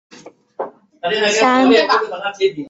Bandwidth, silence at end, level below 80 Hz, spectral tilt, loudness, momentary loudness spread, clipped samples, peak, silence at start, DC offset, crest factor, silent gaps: 8 kHz; 0 s; -64 dBFS; -3 dB/octave; -15 LUFS; 18 LU; under 0.1%; -2 dBFS; 0.25 s; under 0.1%; 16 dB; none